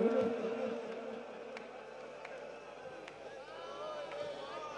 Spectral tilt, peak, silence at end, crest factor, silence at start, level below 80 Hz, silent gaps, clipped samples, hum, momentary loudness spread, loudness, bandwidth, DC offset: -5.5 dB/octave; -20 dBFS; 0 s; 20 dB; 0 s; -76 dBFS; none; under 0.1%; none; 12 LU; -43 LUFS; 10.5 kHz; under 0.1%